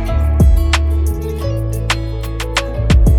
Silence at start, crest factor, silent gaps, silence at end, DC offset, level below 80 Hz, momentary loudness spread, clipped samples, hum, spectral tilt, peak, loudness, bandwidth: 0 s; 12 dB; none; 0 s; under 0.1%; -16 dBFS; 8 LU; under 0.1%; none; -5.5 dB/octave; 0 dBFS; -16 LUFS; 15 kHz